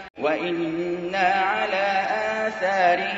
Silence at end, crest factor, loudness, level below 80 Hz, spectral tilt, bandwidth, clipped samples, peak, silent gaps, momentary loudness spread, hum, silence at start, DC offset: 0 s; 16 dB; -23 LUFS; -62 dBFS; -4.5 dB/octave; 8 kHz; under 0.1%; -8 dBFS; 0.10-0.14 s; 6 LU; none; 0 s; under 0.1%